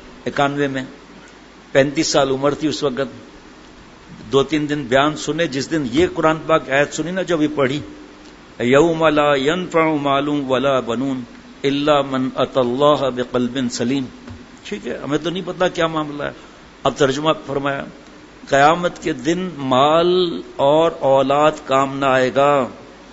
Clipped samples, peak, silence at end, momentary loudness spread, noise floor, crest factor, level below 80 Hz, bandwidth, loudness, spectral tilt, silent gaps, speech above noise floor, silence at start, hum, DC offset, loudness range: under 0.1%; 0 dBFS; 0 s; 12 LU; -42 dBFS; 18 dB; -48 dBFS; 8 kHz; -18 LUFS; -5 dB/octave; none; 25 dB; 0 s; none; under 0.1%; 5 LU